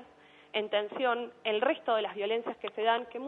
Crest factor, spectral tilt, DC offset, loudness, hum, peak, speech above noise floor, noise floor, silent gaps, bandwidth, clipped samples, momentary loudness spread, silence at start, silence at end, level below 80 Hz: 16 dB; -5.5 dB/octave; under 0.1%; -32 LUFS; none; -16 dBFS; 26 dB; -58 dBFS; none; 4.2 kHz; under 0.1%; 5 LU; 0 s; 0 s; -82 dBFS